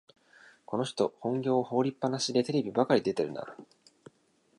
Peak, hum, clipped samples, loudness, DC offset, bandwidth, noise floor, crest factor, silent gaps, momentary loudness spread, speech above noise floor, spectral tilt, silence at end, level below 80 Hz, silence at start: -12 dBFS; none; under 0.1%; -30 LUFS; under 0.1%; 11 kHz; -68 dBFS; 20 dB; none; 9 LU; 39 dB; -5.5 dB/octave; 0.95 s; -74 dBFS; 0.7 s